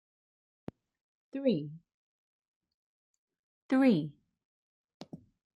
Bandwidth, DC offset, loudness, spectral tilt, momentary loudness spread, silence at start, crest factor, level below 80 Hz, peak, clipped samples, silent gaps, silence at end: 10 kHz; under 0.1%; -30 LUFS; -8 dB/octave; 25 LU; 1.35 s; 20 dB; -78 dBFS; -16 dBFS; under 0.1%; 1.94-2.40 s, 2.48-2.61 s, 2.74-3.28 s, 3.39-3.69 s, 4.45-4.88 s, 4.94-5.00 s; 0.4 s